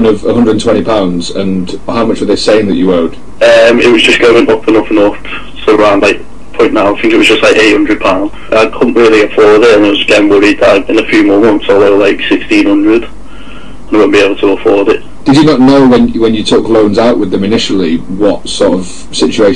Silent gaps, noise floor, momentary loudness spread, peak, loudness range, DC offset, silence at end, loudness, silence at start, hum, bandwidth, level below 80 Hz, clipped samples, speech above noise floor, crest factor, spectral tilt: none; -29 dBFS; 8 LU; 0 dBFS; 3 LU; 9%; 0 s; -7 LUFS; 0 s; none; 11.5 kHz; -34 dBFS; 0.4%; 22 dB; 8 dB; -5 dB/octave